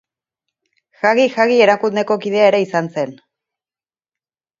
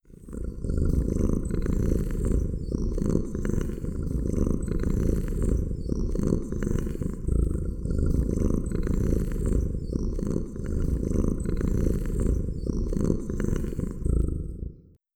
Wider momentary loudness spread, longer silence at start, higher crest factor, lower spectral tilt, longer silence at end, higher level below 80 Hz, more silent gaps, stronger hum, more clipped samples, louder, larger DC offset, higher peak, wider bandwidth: first, 10 LU vs 5 LU; first, 1.05 s vs 0.1 s; about the same, 18 dB vs 18 dB; second, -5 dB/octave vs -8.5 dB/octave; first, 1.45 s vs 0.4 s; second, -70 dBFS vs -28 dBFS; neither; neither; neither; first, -15 LUFS vs -29 LUFS; neither; first, 0 dBFS vs -8 dBFS; second, 7.6 kHz vs 17 kHz